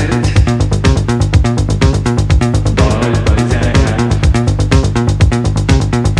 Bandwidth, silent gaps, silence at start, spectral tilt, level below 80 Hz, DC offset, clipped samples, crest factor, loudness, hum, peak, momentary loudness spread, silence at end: 11 kHz; none; 0 s; -6.5 dB/octave; -16 dBFS; under 0.1%; under 0.1%; 10 dB; -12 LUFS; none; 0 dBFS; 1 LU; 0 s